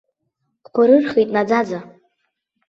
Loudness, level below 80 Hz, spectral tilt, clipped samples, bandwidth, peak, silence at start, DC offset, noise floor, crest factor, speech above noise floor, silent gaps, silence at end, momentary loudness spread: -17 LUFS; -64 dBFS; -7 dB/octave; under 0.1%; 7.4 kHz; -2 dBFS; 0.75 s; under 0.1%; -73 dBFS; 16 dB; 57 dB; none; 0.8 s; 12 LU